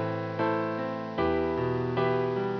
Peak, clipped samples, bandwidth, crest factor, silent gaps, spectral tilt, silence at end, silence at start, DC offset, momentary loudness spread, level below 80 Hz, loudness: -14 dBFS; under 0.1%; 5.4 kHz; 14 dB; none; -8.5 dB/octave; 0 s; 0 s; under 0.1%; 4 LU; -52 dBFS; -29 LUFS